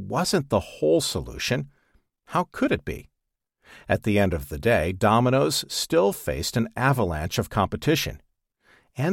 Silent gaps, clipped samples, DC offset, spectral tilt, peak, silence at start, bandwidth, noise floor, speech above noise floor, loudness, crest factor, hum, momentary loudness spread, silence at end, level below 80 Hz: none; under 0.1%; under 0.1%; -5 dB/octave; -6 dBFS; 0 s; 17.5 kHz; -81 dBFS; 57 dB; -24 LUFS; 18 dB; none; 8 LU; 0 s; -44 dBFS